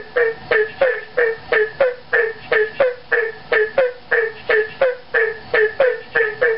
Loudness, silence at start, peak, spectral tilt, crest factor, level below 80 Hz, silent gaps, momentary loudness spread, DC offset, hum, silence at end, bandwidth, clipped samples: -18 LUFS; 0 s; -4 dBFS; -6 dB/octave; 14 dB; -56 dBFS; none; 3 LU; 0.9%; none; 0 s; 5.6 kHz; under 0.1%